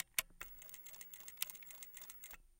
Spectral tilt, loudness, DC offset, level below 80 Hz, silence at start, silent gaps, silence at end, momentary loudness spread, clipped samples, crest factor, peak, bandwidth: 1.5 dB/octave; -47 LUFS; under 0.1%; -68 dBFS; 0 s; none; 0 s; 10 LU; under 0.1%; 34 dB; -16 dBFS; 17 kHz